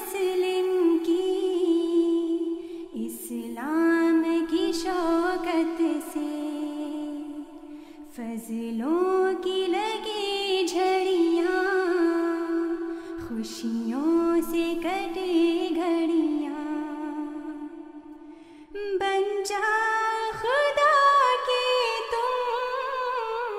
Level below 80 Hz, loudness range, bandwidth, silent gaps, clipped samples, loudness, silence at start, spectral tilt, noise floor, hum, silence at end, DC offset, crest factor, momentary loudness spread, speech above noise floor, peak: -58 dBFS; 7 LU; 16 kHz; none; under 0.1%; -26 LUFS; 0 s; -3.5 dB/octave; -46 dBFS; none; 0 s; under 0.1%; 16 dB; 13 LU; 18 dB; -10 dBFS